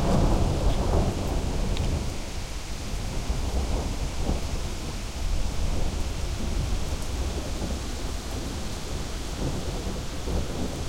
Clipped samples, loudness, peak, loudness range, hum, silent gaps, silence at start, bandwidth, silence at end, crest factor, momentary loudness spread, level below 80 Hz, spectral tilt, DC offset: under 0.1%; -30 LUFS; -10 dBFS; 3 LU; none; none; 0 s; 16 kHz; 0 s; 16 dB; 8 LU; -30 dBFS; -5 dB/octave; under 0.1%